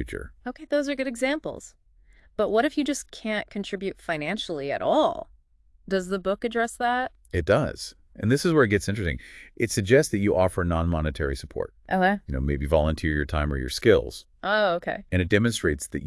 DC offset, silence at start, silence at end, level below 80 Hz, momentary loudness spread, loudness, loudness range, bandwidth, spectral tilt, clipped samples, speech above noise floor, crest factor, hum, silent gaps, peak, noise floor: under 0.1%; 0 s; 0 s; -40 dBFS; 13 LU; -25 LUFS; 4 LU; 12 kHz; -5.5 dB/octave; under 0.1%; 34 dB; 20 dB; none; none; -6 dBFS; -59 dBFS